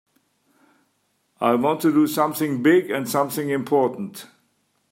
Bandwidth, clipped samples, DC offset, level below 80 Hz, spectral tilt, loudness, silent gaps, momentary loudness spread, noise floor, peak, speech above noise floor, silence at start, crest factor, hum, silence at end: 16.5 kHz; under 0.1%; under 0.1%; -70 dBFS; -5.5 dB/octave; -21 LUFS; none; 7 LU; -69 dBFS; -6 dBFS; 48 dB; 1.4 s; 18 dB; none; 0.65 s